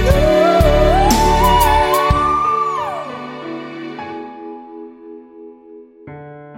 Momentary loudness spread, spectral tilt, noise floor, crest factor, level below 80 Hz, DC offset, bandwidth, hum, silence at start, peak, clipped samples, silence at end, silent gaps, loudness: 23 LU; -5 dB/octave; -40 dBFS; 16 dB; -24 dBFS; under 0.1%; 16.5 kHz; none; 0 s; 0 dBFS; under 0.1%; 0 s; none; -13 LUFS